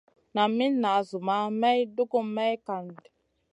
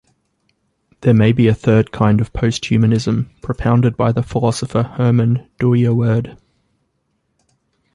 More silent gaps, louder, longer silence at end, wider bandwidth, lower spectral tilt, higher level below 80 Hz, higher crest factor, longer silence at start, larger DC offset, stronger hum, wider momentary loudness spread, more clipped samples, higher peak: neither; second, -27 LUFS vs -16 LUFS; second, 0.6 s vs 1.6 s; about the same, 10.5 kHz vs 11 kHz; second, -6 dB/octave vs -7.5 dB/octave; second, -80 dBFS vs -40 dBFS; about the same, 16 dB vs 14 dB; second, 0.35 s vs 1 s; neither; neither; first, 10 LU vs 7 LU; neither; second, -10 dBFS vs -2 dBFS